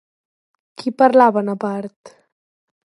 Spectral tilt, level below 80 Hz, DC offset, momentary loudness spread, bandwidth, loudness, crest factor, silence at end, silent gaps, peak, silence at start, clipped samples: -7 dB/octave; -72 dBFS; under 0.1%; 16 LU; 11.5 kHz; -16 LUFS; 18 dB; 0.8 s; 1.96-2.04 s; 0 dBFS; 0.8 s; under 0.1%